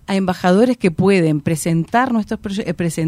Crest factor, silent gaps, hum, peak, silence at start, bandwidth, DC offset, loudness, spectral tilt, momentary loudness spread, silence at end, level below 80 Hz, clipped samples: 14 dB; none; none; -2 dBFS; 0.1 s; 15.5 kHz; under 0.1%; -17 LUFS; -6.5 dB/octave; 8 LU; 0 s; -46 dBFS; under 0.1%